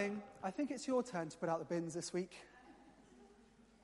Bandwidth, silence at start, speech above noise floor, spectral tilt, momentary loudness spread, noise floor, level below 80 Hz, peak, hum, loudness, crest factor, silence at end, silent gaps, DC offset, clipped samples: 11.5 kHz; 0 s; 25 dB; -5 dB/octave; 22 LU; -66 dBFS; -76 dBFS; -24 dBFS; none; -42 LUFS; 18 dB; 0.5 s; none; under 0.1%; under 0.1%